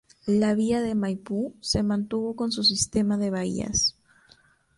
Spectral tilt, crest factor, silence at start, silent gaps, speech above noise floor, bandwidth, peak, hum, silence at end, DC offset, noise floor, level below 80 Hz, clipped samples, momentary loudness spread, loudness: -4 dB/octave; 16 dB; 0.25 s; none; 34 dB; 11.5 kHz; -10 dBFS; none; 0.85 s; under 0.1%; -59 dBFS; -50 dBFS; under 0.1%; 7 LU; -25 LUFS